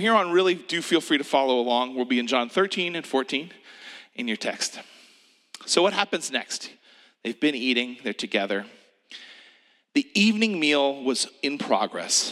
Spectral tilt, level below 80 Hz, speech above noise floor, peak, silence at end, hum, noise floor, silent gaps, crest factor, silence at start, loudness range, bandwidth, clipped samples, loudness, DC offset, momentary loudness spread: -2.5 dB/octave; -88 dBFS; 34 dB; -4 dBFS; 0 s; none; -58 dBFS; none; 22 dB; 0 s; 5 LU; 14 kHz; under 0.1%; -24 LUFS; under 0.1%; 19 LU